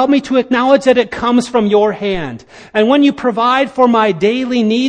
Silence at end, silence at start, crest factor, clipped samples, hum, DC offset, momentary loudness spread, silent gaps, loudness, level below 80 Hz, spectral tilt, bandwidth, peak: 0 s; 0 s; 12 dB; under 0.1%; none; under 0.1%; 8 LU; none; -13 LUFS; -46 dBFS; -5.5 dB/octave; 10 kHz; 0 dBFS